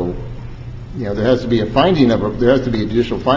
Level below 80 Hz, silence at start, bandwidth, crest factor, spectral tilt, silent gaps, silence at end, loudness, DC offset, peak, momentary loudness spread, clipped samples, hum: -34 dBFS; 0 s; 7.6 kHz; 16 dB; -7.5 dB/octave; none; 0 s; -16 LUFS; under 0.1%; 0 dBFS; 18 LU; under 0.1%; none